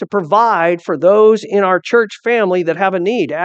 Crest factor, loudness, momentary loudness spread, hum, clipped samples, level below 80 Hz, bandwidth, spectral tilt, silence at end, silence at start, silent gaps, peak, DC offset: 14 dB; -13 LUFS; 6 LU; none; under 0.1%; -70 dBFS; 8.2 kHz; -6 dB/octave; 0 s; 0 s; none; 0 dBFS; under 0.1%